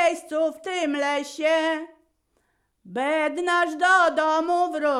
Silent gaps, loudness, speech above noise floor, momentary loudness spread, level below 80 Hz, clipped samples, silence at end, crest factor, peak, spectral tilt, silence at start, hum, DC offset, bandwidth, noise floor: none; -23 LUFS; 47 dB; 9 LU; -68 dBFS; under 0.1%; 0 s; 16 dB; -8 dBFS; -2.5 dB/octave; 0 s; none; under 0.1%; 13 kHz; -70 dBFS